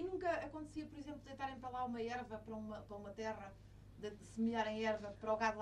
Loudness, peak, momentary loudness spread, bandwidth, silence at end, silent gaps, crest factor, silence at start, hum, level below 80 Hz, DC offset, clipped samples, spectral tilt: -44 LUFS; -24 dBFS; 13 LU; 11 kHz; 0 s; none; 20 dB; 0 s; 50 Hz at -60 dBFS; -64 dBFS; under 0.1%; under 0.1%; -5.5 dB/octave